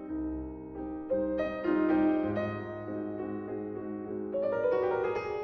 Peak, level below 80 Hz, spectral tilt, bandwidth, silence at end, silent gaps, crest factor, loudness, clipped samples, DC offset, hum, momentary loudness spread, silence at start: -16 dBFS; -54 dBFS; -9 dB/octave; 6 kHz; 0 s; none; 16 dB; -32 LUFS; under 0.1%; under 0.1%; none; 11 LU; 0 s